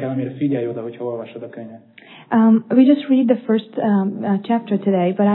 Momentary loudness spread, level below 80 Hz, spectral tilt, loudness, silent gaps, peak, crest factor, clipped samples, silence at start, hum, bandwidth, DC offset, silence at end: 17 LU; -78 dBFS; -12 dB/octave; -18 LUFS; none; -2 dBFS; 16 dB; under 0.1%; 0 s; none; 4.2 kHz; under 0.1%; 0 s